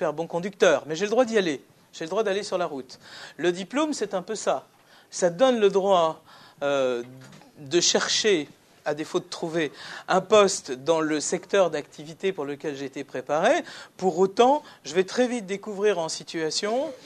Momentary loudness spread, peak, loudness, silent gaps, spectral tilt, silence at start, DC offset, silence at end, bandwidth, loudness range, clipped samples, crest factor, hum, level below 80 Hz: 13 LU; -6 dBFS; -25 LUFS; none; -3.5 dB/octave; 0 s; under 0.1%; 0.1 s; 13 kHz; 3 LU; under 0.1%; 20 dB; none; -74 dBFS